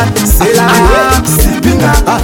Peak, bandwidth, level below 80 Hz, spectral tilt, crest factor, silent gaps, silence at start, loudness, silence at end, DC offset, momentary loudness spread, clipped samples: 0 dBFS; 19.5 kHz; -14 dBFS; -4.5 dB/octave; 8 dB; none; 0 s; -8 LUFS; 0 s; under 0.1%; 3 LU; 0.3%